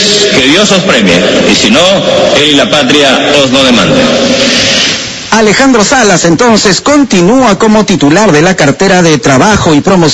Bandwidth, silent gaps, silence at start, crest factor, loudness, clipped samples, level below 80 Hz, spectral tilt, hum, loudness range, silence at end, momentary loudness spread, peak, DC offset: 11 kHz; none; 0 s; 6 dB; -5 LUFS; 5%; -32 dBFS; -3.5 dB/octave; none; 1 LU; 0 s; 2 LU; 0 dBFS; under 0.1%